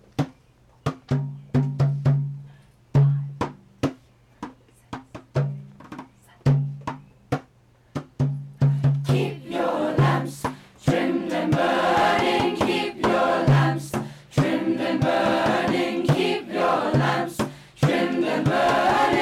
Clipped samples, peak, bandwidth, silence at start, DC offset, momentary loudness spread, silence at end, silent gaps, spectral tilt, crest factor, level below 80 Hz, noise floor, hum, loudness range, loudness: under 0.1%; -10 dBFS; 13 kHz; 0.2 s; under 0.1%; 16 LU; 0 s; none; -7 dB/octave; 14 dB; -50 dBFS; -57 dBFS; none; 8 LU; -23 LUFS